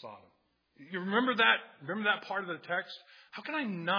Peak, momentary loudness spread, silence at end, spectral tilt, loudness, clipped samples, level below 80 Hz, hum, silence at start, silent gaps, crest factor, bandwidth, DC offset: -10 dBFS; 20 LU; 0 s; -6 dB/octave; -31 LUFS; under 0.1%; under -90 dBFS; none; 0 s; none; 22 dB; 5.4 kHz; under 0.1%